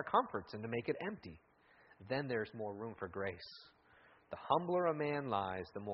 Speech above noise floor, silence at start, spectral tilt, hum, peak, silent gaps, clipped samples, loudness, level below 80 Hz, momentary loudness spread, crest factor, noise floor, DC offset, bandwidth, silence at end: 27 dB; 0 s; -4.5 dB/octave; none; -18 dBFS; none; under 0.1%; -39 LUFS; -74 dBFS; 17 LU; 22 dB; -67 dBFS; under 0.1%; 5.8 kHz; 0 s